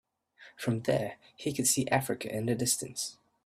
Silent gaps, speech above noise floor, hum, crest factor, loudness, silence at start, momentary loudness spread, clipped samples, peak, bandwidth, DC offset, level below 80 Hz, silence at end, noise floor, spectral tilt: none; 27 dB; none; 20 dB; -31 LUFS; 0.4 s; 10 LU; under 0.1%; -12 dBFS; 16 kHz; under 0.1%; -66 dBFS; 0.3 s; -58 dBFS; -3.5 dB/octave